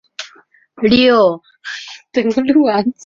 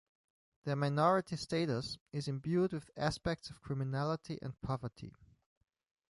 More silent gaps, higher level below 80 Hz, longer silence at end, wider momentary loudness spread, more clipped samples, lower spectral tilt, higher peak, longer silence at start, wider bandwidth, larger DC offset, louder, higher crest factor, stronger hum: second, none vs 2.01-2.06 s; first, -50 dBFS vs -62 dBFS; second, 0.15 s vs 1 s; first, 19 LU vs 12 LU; neither; about the same, -5.5 dB/octave vs -6.5 dB/octave; first, -2 dBFS vs -18 dBFS; second, 0.2 s vs 0.65 s; second, 7.4 kHz vs 11.5 kHz; neither; first, -13 LUFS vs -37 LUFS; second, 14 dB vs 20 dB; neither